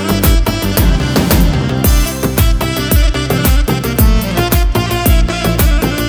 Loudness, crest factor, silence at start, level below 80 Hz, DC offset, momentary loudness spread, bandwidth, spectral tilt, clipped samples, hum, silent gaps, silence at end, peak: -13 LUFS; 10 dB; 0 s; -14 dBFS; under 0.1%; 2 LU; over 20 kHz; -5 dB/octave; under 0.1%; none; none; 0 s; 0 dBFS